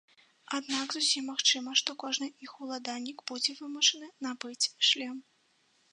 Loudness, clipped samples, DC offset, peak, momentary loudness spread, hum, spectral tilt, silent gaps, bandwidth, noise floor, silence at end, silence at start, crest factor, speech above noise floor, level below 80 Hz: -30 LUFS; under 0.1%; under 0.1%; -8 dBFS; 13 LU; none; 1 dB/octave; none; 11 kHz; -70 dBFS; 0.7 s; 0.5 s; 24 dB; 38 dB; under -90 dBFS